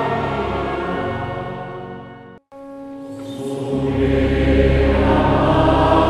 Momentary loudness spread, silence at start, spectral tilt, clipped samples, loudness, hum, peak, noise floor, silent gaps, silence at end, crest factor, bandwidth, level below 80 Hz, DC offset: 19 LU; 0 s; -8 dB/octave; under 0.1%; -18 LUFS; none; 0 dBFS; -39 dBFS; none; 0 s; 18 dB; 11 kHz; -26 dBFS; under 0.1%